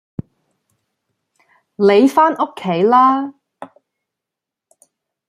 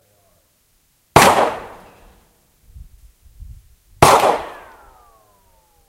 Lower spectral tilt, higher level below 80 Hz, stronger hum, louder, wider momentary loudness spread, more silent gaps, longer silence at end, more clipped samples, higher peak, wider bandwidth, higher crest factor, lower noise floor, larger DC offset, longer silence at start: first, -6.5 dB/octave vs -3.5 dB/octave; second, -62 dBFS vs -42 dBFS; neither; about the same, -14 LUFS vs -14 LUFS; second, 19 LU vs 22 LU; neither; first, 1.65 s vs 1.35 s; neither; about the same, -2 dBFS vs 0 dBFS; second, 14.5 kHz vs 16 kHz; about the same, 16 dB vs 20 dB; first, -84 dBFS vs -60 dBFS; neither; first, 1.8 s vs 1.15 s